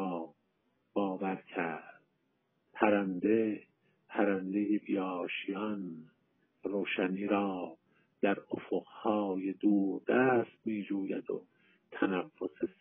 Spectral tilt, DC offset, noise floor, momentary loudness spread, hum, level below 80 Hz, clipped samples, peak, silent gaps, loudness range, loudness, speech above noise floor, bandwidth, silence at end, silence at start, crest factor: -3 dB/octave; under 0.1%; -78 dBFS; 12 LU; none; -82 dBFS; under 0.1%; -10 dBFS; none; 3 LU; -34 LUFS; 45 dB; 3.6 kHz; 0.1 s; 0 s; 24 dB